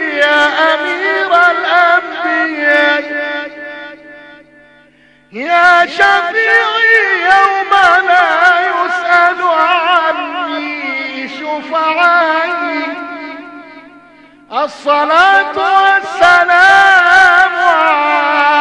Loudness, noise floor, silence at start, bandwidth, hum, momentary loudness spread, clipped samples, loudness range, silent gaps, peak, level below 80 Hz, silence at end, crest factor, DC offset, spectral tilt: -10 LUFS; -47 dBFS; 0 s; 11 kHz; none; 14 LU; 0.6%; 8 LU; none; 0 dBFS; -54 dBFS; 0 s; 12 dB; under 0.1%; -2 dB/octave